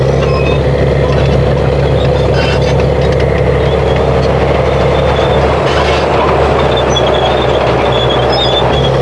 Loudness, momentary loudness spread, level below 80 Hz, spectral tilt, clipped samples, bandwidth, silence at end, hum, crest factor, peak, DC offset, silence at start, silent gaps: -10 LUFS; 1 LU; -18 dBFS; -6.5 dB/octave; under 0.1%; 11 kHz; 0 s; none; 10 dB; 0 dBFS; 0.4%; 0 s; none